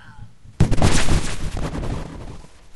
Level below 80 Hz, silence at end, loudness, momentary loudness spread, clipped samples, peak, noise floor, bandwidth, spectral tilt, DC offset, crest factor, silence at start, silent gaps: -26 dBFS; 0 s; -23 LUFS; 21 LU; under 0.1%; -2 dBFS; -42 dBFS; 12 kHz; -5 dB/octave; under 0.1%; 18 dB; 0 s; none